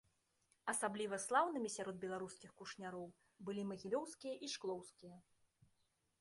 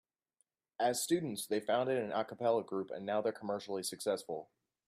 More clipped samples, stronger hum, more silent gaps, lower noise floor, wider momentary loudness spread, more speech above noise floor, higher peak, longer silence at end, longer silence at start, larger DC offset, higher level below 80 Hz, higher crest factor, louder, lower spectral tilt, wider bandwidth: neither; neither; neither; about the same, -82 dBFS vs -81 dBFS; first, 17 LU vs 7 LU; second, 38 dB vs 45 dB; second, -24 dBFS vs -20 dBFS; first, 1 s vs 0.45 s; second, 0.65 s vs 0.8 s; neither; about the same, -84 dBFS vs -82 dBFS; first, 22 dB vs 16 dB; second, -44 LUFS vs -36 LUFS; about the same, -3.5 dB/octave vs -4 dB/octave; second, 11.5 kHz vs 15.5 kHz